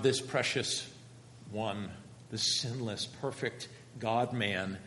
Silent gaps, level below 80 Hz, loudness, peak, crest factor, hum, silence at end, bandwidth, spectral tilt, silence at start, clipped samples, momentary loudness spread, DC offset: none; -72 dBFS; -34 LUFS; -16 dBFS; 20 dB; none; 0 s; 11.5 kHz; -3.5 dB/octave; 0 s; under 0.1%; 16 LU; under 0.1%